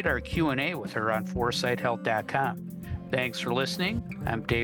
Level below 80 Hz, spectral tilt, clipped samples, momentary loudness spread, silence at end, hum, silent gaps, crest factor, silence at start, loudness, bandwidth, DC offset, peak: -46 dBFS; -5.5 dB/octave; under 0.1%; 5 LU; 0 s; none; none; 18 dB; 0 s; -29 LUFS; 19.5 kHz; under 0.1%; -12 dBFS